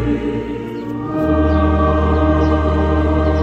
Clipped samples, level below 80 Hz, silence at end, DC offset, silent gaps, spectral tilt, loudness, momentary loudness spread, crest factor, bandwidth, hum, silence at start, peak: under 0.1%; -24 dBFS; 0 s; under 0.1%; none; -9 dB/octave; -17 LUFS; 10 LU; 12 dB; 6.2 kHz; none; 0 s; -2 dBFS